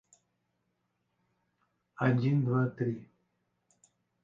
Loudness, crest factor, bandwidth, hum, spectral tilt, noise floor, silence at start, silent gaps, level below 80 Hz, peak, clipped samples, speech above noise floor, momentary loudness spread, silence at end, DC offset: -30 LUFS; 22 dB; 7.8 kHz; none; -9 dB/octave; -80 dBFS; 2 s; none; -74 dBFS; -12 dBFS; under 0.1%; 51 dB; 8 LU; 1.2 s; under 0.1%